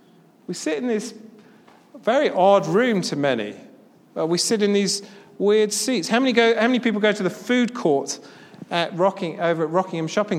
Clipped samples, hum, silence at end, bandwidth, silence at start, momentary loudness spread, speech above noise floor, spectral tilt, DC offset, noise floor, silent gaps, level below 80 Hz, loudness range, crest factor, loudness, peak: under 0.1%; none; 0 s; 15.5 kHz; 0.5 s; 10 LU; 30 dB; -4 dB/octave; under 0.1%; -51 dBFS; none; -76 dBFS; 2 LU; 20 dB; -21 LUFS; -2 dBFS